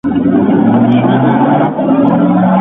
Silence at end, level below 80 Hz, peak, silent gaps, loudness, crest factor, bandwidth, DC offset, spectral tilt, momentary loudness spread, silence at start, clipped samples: 0 s; -42 dBFS; 0 dBFS; none; -10 LUFS; 10 dB; 3.9 kHz; under 0.1%; -11 dB/octave; 2 LU; 0.05 s; under 0.1%